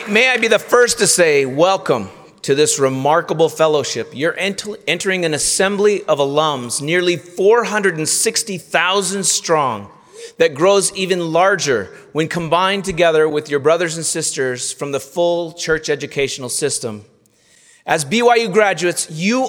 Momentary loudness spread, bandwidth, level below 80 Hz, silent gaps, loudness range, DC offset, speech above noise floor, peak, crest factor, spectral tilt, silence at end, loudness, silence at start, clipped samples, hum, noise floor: 8 LU; 18 kHz; -54 dBFS; none; 4 LU; under 0.1%; 37 dB; 0 dBFS; 16 dB; -3 dB/octave; 0 s; -16 LUFS; 0 s; under 0.1%; none; -53 dBFS